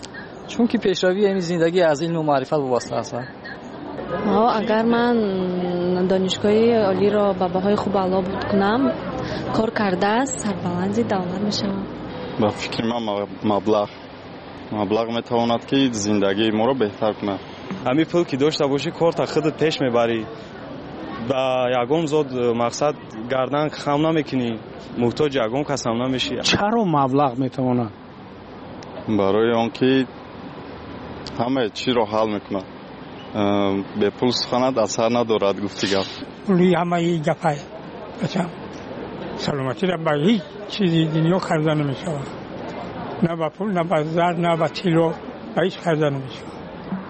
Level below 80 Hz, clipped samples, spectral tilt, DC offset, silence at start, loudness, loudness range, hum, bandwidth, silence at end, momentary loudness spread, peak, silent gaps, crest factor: -52 dBFS; under 0.1%; -5.5 dB/octave; under 0.1%; 0 s; -21 LUFS; 4 LU; none; 8.4 kHz; 0 s; 15 LU; -6 dBFS; none; 14 dB